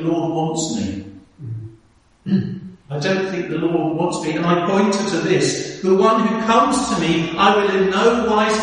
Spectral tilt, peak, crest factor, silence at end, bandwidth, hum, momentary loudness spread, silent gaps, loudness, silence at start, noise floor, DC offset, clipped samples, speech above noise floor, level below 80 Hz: -5 dB/octave; 0 dBFS; 18 dB; 0 s; 11 kHz; none; 15 LU; none; -18 LUFS; 0 s; -54 dBFS; under 0.1%; under 0.1%; 36 dB; -50 dBFS